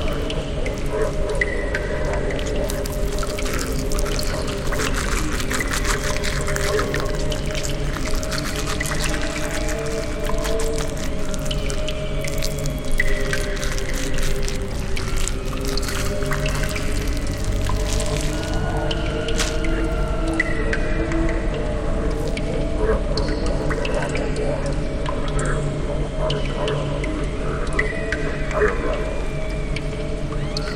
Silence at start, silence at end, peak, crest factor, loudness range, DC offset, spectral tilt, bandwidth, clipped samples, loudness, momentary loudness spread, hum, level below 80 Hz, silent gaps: 0 s; 0 s; -2 dBFS; 18 dB; 2 LU; under 0.1%; -4.5 dB/octave; 16.5 kHz; under 0.1%; -24 LUFS; 4 LU; none; -24 dBFS; none